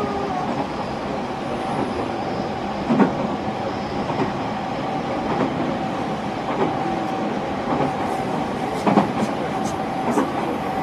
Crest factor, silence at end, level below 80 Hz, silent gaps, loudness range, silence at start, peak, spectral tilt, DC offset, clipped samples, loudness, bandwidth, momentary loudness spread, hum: 22 dB; 0 s; -48 dBFS; none; 2 LU; 0 s; -2 dBFS; -6.5 dB/octave; under 0.1%; under 0.1%; -23 LUFS; 13.5 kHz; 7 LU; none